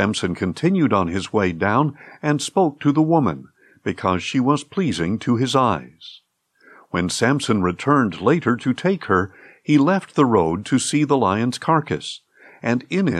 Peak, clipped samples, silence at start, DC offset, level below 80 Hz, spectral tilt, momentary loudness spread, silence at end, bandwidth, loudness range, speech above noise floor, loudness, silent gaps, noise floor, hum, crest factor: -4 dBFS; under 0.1%; 0 s; under 0.1%; -60 dBFS; -5.5 dB/octave; 10 LU; 0 s; 12.5 kHz; 3 LU; 36 dB; -20 LUFS; none; -55 dBFS; none; 16 dB